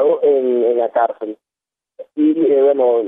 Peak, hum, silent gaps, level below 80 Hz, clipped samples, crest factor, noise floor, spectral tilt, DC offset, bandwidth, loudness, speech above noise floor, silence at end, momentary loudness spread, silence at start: -4 dBFS; none; none; -72 dBFS; under 0.1%; 12 dB; -87 dBFS; -9.5 dB/octave; under 0.1%; 3.8 kHz; -15 LUFS; 72 dB; 0 s; 14 LU; 0 s